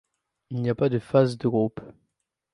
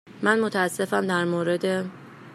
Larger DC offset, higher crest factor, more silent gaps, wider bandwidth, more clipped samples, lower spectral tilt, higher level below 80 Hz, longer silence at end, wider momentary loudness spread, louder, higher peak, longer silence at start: neither; about the same, 20 dB vs 20 dB; neither; second, 11 kHz vs 14.5 kHz; neither; first, -8.5 dB/octave vs -5 dB/octave; first, -62 dBFS vs -72 dBFS; first, 0.65 s vs 0 s; first, 11 LU vs 8 LU; about the same, -24 LUFS vs -24 LUFS; about the same, -6 dBFS vs -6 dBFS; first, 0.5 s vs 0.05 s